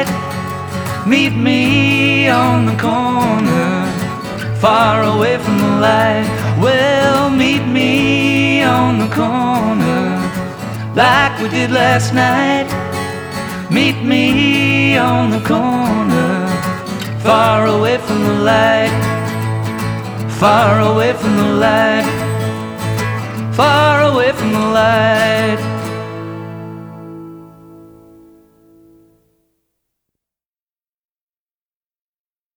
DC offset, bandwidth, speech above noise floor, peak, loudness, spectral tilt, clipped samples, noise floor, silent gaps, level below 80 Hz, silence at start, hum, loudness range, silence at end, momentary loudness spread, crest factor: under 0.1%; over 20 kHz; over 78 dB; 0 dBFS; -13 LUFS; -5.5 dB/octave; under 0.1%; under -90 dBFS; none; -44 dBFS; 0 s; none; 2 LU; 4.75 s; 11 LU; 14 dB